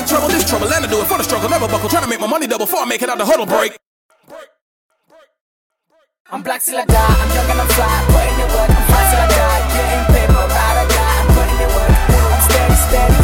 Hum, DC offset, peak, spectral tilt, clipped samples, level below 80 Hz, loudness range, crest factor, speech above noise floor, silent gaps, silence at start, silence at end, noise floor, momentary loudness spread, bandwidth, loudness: none; under 0.1%; 0 dBFS; -4.5 dB/octave; under 0.1%; -18 dBFS; 8 LU; 14 dB; 47 dB; 3.86-4.09 s, 4.61-4.89 s, 5.41-5.70 s, 6.20-6.25 s; 0 s; 0 s; -60 dBFS; 5 LU; 17 kHz; -14 LUFS